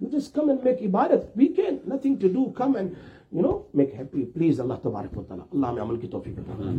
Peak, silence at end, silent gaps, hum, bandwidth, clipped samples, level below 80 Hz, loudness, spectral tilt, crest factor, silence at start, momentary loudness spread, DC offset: -6 dBFS; 0 s; none; none; 8.4 kHz; under 0.1%; -54 dBFS; -25 LUFS; -9 dB/octave; 18 dB; 0 s; 12 LU; under 0.1%